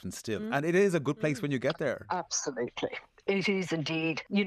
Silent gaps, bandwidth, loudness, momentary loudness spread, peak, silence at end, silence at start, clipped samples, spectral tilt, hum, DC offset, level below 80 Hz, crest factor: none; 13.5 kHz; -31 LUFS; 10 LU; -14 dBFS; 0 s; 0.05 s; under 0.1%; -4.5 dB/octave; none; under 0.1%; -68 dBFS; 16 dB